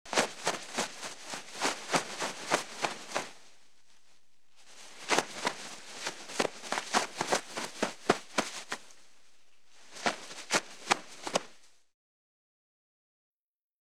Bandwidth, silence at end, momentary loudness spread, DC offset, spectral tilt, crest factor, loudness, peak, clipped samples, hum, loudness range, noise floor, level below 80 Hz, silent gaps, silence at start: 17.5 kHz; 0 s; 12 LU; 0.3%; -1.5 dB/octave; 30 dB; -34 LUFS; -6 dBFS; under 0.1%; none; 3 LU; -70 dBFS; -76 dBFS; none; 0.05 s